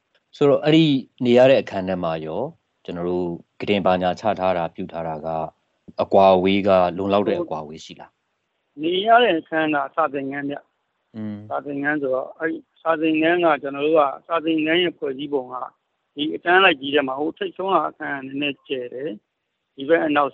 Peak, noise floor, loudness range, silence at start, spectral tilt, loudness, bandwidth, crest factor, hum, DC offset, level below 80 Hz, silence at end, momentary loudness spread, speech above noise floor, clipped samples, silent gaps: -2 dBFS; -76 dBFS; 4 LU; 0.35 s; -7 dB/octave; -20 LUFS; 7.6 kHz; 20 dB; none; under 0.1%; -62 dBFS; 0.05 s; 17 LU; 55 dB; under 0.1%; none